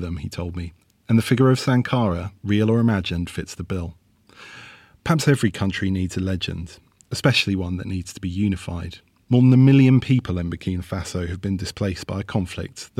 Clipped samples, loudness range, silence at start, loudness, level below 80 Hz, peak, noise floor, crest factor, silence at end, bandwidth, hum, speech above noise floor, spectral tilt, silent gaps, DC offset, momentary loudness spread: under 0.1%; 5 LU; 0 s; -21 LUFS; -48 dBFS; -6 dBFS; -47 dBFS; 16 dB; 0.15 s; 14 kHz; none; 27 dB; -6.5 dB/octave; none; under 0.1%; 16 LU